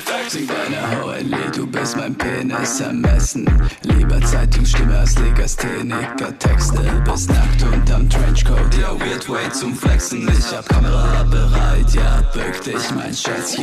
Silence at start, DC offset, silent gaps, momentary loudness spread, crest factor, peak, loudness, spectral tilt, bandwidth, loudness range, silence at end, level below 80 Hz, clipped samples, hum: 0 s; under 0.1%; none; 5 LU; 12 dB; -2 dBFS; -18 LUFS; -5 dB/octave; 13.5 kHz; 2 LU; 0 s; -16 dBFS; under 0.1%; none